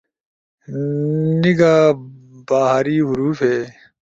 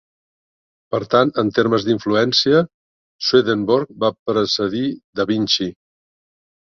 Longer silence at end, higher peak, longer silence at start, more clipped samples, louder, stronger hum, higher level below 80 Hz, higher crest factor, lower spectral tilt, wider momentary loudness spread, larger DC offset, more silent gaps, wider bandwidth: second, 0.45 s vs 0.95 s; about the same, -2 dBFS vs -2 dBFS; second, 0.7 s vs 0.9 s; neither; about the same, -17 LUFS vs -18 LUFS; neither; about the same, -56 dBFS vs -56 dBFS; about the same, 16 dB vs 18 dB; first, -7.5 dB/octave vs -5 dB/octave; first, 13 LU vs 9 LU; neither; second, none vs 2.74-3.19 s, 4.19-4.26 s, 5.04-5.13 s; about the same, 7.8 kHz vs 7.2 kHz